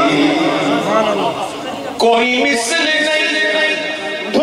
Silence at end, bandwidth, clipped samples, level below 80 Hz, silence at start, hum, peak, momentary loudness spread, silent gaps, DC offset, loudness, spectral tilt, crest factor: 0 s; 15 kHz; under 0.1%; -56 dBFS; 0 s; none; 0 dBFS; 8 LU; none; under 0.1%; -14 LUFS; -3 dB/octave; 14 dB